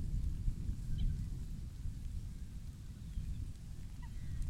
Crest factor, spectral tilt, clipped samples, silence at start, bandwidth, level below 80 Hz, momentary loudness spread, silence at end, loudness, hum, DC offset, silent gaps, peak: 18 dB; -7 dB/octave; under 0.1%; 0 s; 14 kHz; -42 dBFS; 9 LU; 0 s; -45 LUFS; none; under 0.1%; none; -22 dBFS